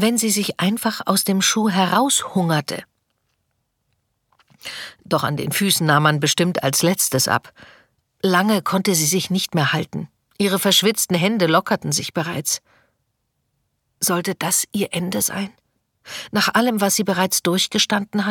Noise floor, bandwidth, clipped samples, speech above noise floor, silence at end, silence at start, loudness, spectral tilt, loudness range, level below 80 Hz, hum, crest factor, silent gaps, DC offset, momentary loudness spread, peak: -72 dBFS; 19 kHz; under 0.1%; 53 dB; 0 s; 0 s; -19 LUFS; -3.5 dB/octave; 5 LU; -62 dBFS; none; 18 dB; none; under 0.1%; 9 LU; -2 dBFS